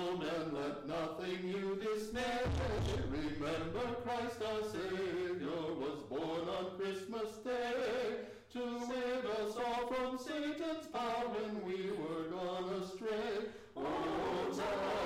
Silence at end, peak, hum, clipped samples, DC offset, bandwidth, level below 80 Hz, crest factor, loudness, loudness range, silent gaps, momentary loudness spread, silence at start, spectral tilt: 0 s; -32 dBFS; none; under 0.1%; under 0.1%; 16 kHz; -56 dBFS; 6 dB; -40 LUFS; 1 LU; none; 4 LU; 0 s; -5.5 dB/octave